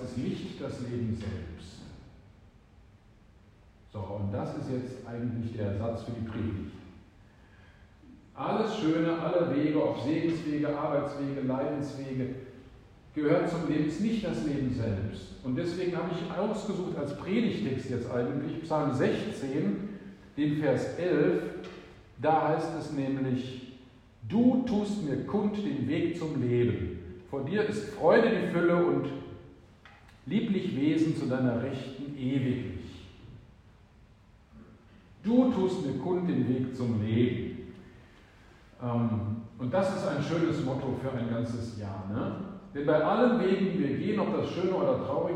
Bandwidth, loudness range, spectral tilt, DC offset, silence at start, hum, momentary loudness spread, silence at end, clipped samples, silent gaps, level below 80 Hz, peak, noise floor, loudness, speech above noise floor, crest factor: 10.5 kHz; 8 LU; -7.5 dB/octave; under 0.1%; 0 s; none; 13 LU; 0 s; under 0.1%; none; -58 dBFS; -10 dBFS; -58 dBFS; -30 LUFS; 28 dB; 20 dB